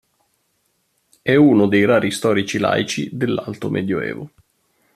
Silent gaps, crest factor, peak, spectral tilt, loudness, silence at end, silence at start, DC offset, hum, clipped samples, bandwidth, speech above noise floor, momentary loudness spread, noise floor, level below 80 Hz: none; 16 dB; -2 dBFS; -5.5 dB/octave; -18 LUFS; 0.7 s; 1.25 s; under 0.1%; none; under 0.1%; 14 kHz; 50 dB; 13 LU; -67 dBFS; -58 dBFS